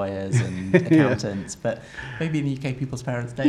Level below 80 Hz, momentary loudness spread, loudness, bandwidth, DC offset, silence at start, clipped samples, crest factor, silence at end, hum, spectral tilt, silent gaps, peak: -52 dBFS; 11 LU; -24 LUFS; 11.5 kHz; under 0.1%; 0 s; under 0.1%; 20 dB; 0 s; none; -6.5 dB/octave; none; -2 dBFS